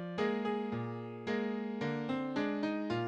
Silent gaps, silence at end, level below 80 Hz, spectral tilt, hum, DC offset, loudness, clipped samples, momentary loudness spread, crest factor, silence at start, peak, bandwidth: none; 0 s; -74 dBFS; -7.5 dB/octave; none; under 0.1%; -37 LUFS; under 0.1%; 5 LU; 16 dB; 0 s; -20 dBFS; 8.6 kHz